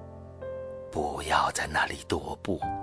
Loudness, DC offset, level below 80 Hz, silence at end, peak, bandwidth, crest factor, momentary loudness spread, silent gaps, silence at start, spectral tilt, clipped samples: -30 LUFS; under 0.1%; -48 dBFS; 0 s; -10 dBFS; 11 kHz; 20 dB; 14 LU; none; 0 s; -3.5 dB/octave; under 0.1%